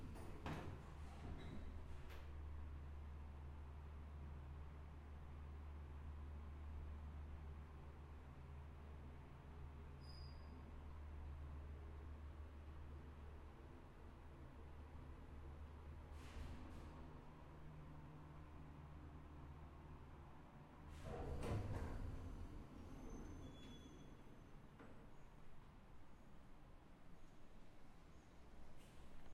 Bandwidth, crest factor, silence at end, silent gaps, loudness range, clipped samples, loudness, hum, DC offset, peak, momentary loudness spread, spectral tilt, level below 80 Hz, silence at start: 13 kHz; 20 dB; 0 s; none; 11 LU; under 0.1%; -58 LUFS; none; under 0.1%; -34 dBFS; 12 LU; -7 dB/octave; -58 dBFS; 0 s